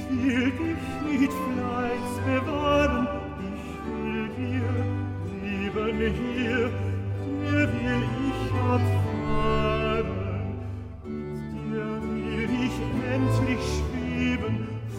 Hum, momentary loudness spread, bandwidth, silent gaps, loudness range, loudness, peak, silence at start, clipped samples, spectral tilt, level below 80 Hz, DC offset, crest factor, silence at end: none; 9 LU; 15 kHz; none; 4 LU; -27 LUFS; -10 dBFS; 0 s; under 0.1%; -7 dB/octave; -40 dBFS; under 0.1%; 16 dB; 0 s